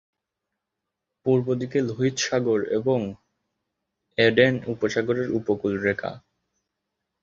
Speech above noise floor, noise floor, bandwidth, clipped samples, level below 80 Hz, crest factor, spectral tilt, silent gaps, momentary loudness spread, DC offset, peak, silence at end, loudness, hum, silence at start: 61 dB; -84 dBFS; 7.8 kHz; under 0.1%; -60 dBFS; 22 dB; -5 dB/octave; none; 9 LU; under 0.1%; -4 dBFS; 1.05 s; -24 LUFS; none; 1.25 s